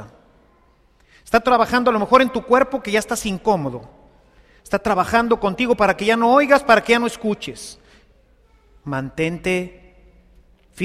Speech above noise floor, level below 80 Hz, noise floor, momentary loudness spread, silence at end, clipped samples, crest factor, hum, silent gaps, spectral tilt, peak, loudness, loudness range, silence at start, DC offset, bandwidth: 38 dB; -46 dBFS; -56 dBFS; 14 LU; 0 s; under 0.1%; 20 dB; none; none; -4.5 dB/octave; 0 dBFS; -18 LUFS; 9 LU; 0 s; under 0.1%; 15 kHz